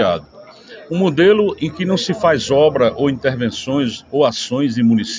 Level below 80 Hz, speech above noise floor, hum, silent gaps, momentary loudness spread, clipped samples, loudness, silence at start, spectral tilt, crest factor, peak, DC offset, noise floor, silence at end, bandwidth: -48 dBFS; 23 dB; none; none; 7 LU; under 0.1%; -16 LUFS; 0 s; -5.5 dB/octave; 14 dB; -2 dBFS; under 0.1%; -39 dBFS; 0 s; 7.6 kHz